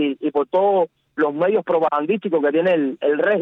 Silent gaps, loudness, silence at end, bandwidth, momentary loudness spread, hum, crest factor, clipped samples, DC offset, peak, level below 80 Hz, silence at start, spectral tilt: none; -19 LUFS; 0 s; 4.2 kHz; 5 LU; none; 10 dB; under 0.1%; under 0.1%; -8 dBFS; -68 dBFS; 0 s; -8.5 dB/octave